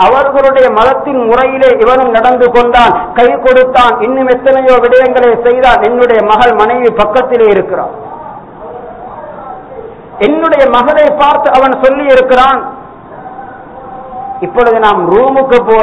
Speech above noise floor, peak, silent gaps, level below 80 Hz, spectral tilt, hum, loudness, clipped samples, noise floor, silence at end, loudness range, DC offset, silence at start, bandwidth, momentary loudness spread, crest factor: 21 dB; 0 dBFS; none; -34 dBFS; -6 dB/octave; none; -7 LUFS; 2%; -28 dBFS; 0 s; 6 LU; 0.6%; 0 s; 7.8 kHz; 20 LU; 8 dB